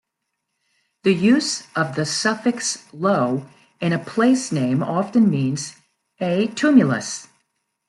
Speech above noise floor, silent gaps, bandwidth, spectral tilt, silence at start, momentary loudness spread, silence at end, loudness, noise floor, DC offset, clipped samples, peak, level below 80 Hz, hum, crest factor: 59 dB; none; 12 kHz; -5 dB/octave; 1.05 s; 10 LU; 0.65 s; -20 LUFS; -78 dBFS; under 0.1%; under 0.1%; -2 dBFS; -66 dBFS; none; 18 dB